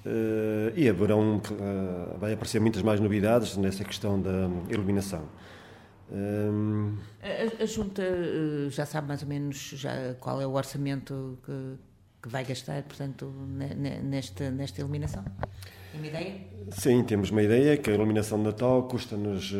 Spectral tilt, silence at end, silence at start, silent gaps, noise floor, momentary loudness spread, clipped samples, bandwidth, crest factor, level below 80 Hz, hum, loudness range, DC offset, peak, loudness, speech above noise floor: -6.5 dB/octave; 0 s; 0 s; none; -51 dBFS; 14 LU; under 0.1%; 16 kHz; 20 dB; -56 dBFS; none; 9 LU; under 0.1%; -10 dBFS; -29 LUFS; 22 dB